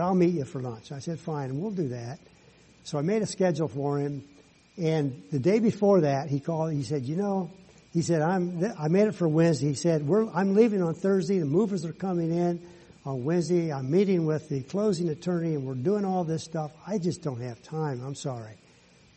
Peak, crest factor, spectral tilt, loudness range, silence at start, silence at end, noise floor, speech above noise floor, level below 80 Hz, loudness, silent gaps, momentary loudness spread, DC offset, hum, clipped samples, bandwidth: -8 dBFS; 18 dB; -7.5 dB/octave; 6 LU; 0 s; 0.6 s; -58 dBFS; 31 dB; -66 dBFS; -27 LUFS; none; 12 LU; under 0.1%; none; under 0.1%; 8.4 kHz